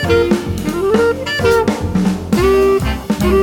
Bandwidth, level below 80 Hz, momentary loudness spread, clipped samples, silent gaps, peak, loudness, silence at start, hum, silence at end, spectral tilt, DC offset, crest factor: 19 kHz; -28 dBFS; 5 LU; under 0.1%; none; 0 dBFS; -15 LUFS; 0 s; none; 0 s; -6 dB/octave; 0.1%; 14 dB